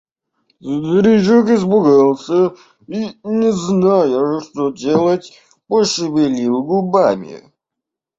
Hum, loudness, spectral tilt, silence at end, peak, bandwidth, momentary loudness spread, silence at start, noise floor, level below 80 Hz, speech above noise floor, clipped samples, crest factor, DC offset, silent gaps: none; -15 LUFS; -6 dB/octave; 0.8 s; -2 dBFS; 7.8 kHz; 12 LU; 0.65 s; -82 dBFS; -56 dBFS; 68 dB; under 0.1%; 14 dB; under 0.1%; none